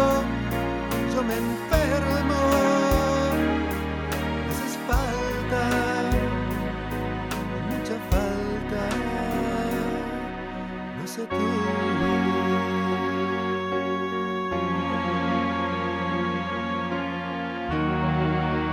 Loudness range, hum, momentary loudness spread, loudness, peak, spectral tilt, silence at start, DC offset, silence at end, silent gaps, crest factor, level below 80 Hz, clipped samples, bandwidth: 4 LU; none; 7 LU; -26 LUFS; -8 dBFS; -6 dB/octave; 0 s; under 0.1%; 0 s; none; 18 dB; -36 dBFS; under 0.1%; 19.5 kHz